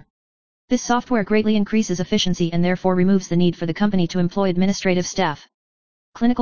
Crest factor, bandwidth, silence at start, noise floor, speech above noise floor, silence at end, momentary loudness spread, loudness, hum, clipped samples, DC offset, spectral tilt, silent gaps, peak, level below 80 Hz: 16 dB; 7.2 kHz; 0 s; under -90 dBFS; over 71 dB; 0 s; 4 LU; -20 LUFS; none; under 0.1%; 2%; -5.5 dB/octave; 0.10-0.68 s, 5.54-6.12 s; -4 dBFS; -48 dBFS